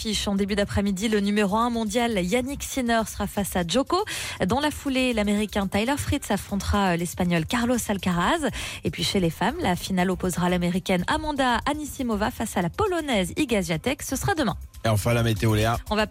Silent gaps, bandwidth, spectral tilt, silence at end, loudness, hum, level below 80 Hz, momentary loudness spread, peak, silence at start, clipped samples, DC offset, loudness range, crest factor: none; 16.5 kHz; -5 dB/octave; 0 s; -25 LUFS; none; -40 dBFS; 4 LU; -12 dBFS; 0 s; under 0.1%; under 0.1%; 1 LU; 12 dB